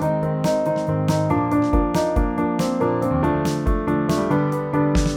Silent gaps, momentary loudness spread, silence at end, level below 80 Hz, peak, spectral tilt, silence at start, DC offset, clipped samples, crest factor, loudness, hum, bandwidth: none; 2 LU; 0 s; -30 dBFS; -6 dBFS; -7 dB/octave; 0 s; under 0.1%; under 0.1%; 14 dB; -21 LUFS; none; 18 kHz